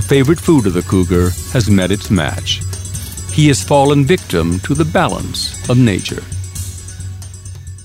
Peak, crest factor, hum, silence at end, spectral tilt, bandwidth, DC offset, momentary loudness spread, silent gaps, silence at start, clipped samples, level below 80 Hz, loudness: 0 dBFS; 14 dB; none; 0 s; -5.5 dB/octave; 16.5 kHz; under 0.1%; 16 LU; none; 0 s; under 0.1%; -32 dBFS; -14 LUFS